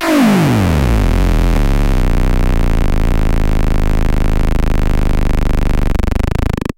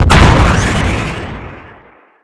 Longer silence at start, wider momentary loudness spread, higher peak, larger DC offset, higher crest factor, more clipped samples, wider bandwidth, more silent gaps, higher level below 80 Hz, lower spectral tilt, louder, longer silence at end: about the same, 0 s vs 0 s; second, 5 LU vs 20 LU; about the same, 0 dBFS vs 0 dBFS; neither; about the same, 12 dB vs 12 dB; neither; first, 16.5 kHz vs 11 kHz; neither; first, -12 dBFS vs -18 dBFS; about the same, -6.5 dB/octave vs -5.5 dB/octave; second, -16 LUFS vs -11 LUFS; second, 0.05 s vs 0.65 s